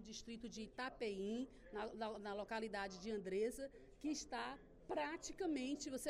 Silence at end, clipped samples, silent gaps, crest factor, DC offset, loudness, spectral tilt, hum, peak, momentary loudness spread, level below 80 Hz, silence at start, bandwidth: 0 s; under 0.1%; none; 16 dB; under 0.1%; -47 LUFS; -3.5 dB/octave; none; -32 dBFS; 8 LU; -68 dBFS; 0 s; 13 kHz